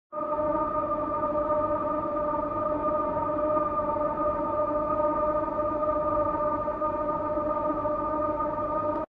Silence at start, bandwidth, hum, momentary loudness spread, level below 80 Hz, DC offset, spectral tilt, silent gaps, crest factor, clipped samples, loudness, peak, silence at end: 0.1 s; 4.1 kHz; none; 2 LU; -48 dBFS; under 0.1%; -10 dB/octave; none; 14 dB; under 0.1%; -28 LUFS; -14 dBFS; 0.05 s